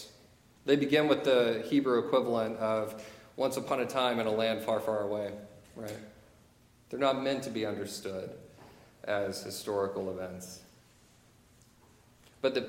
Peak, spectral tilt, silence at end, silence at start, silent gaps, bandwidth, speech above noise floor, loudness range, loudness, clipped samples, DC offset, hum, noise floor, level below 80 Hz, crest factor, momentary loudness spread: -12 dBFS; -5 dB/octave; 0 s; 0 s; none; 17 kHz; 31 dB; 9 LU; -31 LUFS; under 0.1%; under 0.1%; none; -62 dBFS; -70 dBFS; 20 dB; 19 LU